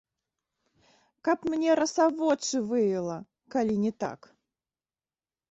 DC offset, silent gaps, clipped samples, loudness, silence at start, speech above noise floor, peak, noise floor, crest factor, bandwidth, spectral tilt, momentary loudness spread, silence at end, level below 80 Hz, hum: under 0.1%; none; under 0.1%; -28 LUFS; 1.25 s; over 63 dB; -12 dBFS; under -90 dBFS; 18 dB; 8.2 kHz; -4.5 dB/octave; 11 LU; 1.35 s; -70 dBFS; none